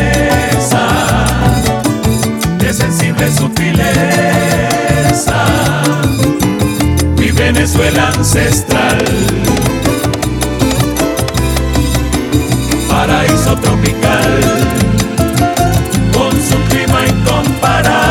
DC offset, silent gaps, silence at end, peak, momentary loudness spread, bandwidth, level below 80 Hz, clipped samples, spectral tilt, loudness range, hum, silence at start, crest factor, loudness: under 0.1%; none; 0 s; 0 dBFS; 3 LU; 18.5 kHz; -22 dBFS; under 0.1%; -5 dB/octave; 2 LU; none; 0 s; 10 dB; -11 LUFS